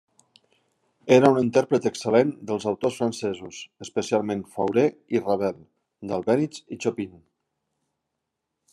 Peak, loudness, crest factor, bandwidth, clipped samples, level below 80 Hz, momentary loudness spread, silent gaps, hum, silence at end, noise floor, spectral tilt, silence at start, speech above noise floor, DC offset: -4 dBFS; -24 LUFS; 22 dB; 12.5 kHz; under 0.1%; -70 dBFS; 16 LU; none; none; 1.65 s; -82 dBFS; -6 dB/octave; 1.05 s; 58 dB; under 0.1%